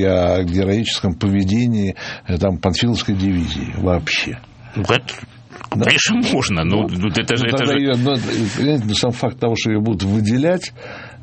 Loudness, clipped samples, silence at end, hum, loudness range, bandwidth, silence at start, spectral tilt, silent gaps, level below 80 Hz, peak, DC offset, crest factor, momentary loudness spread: -18 LUFS; under 0.1%; 0 s; none; 3 LU; 8.8 kHz; 0 s; -5 dB/octave; none; -40 dBFS; 0 dBFS; under 0.1%; 18 dB; 10 LU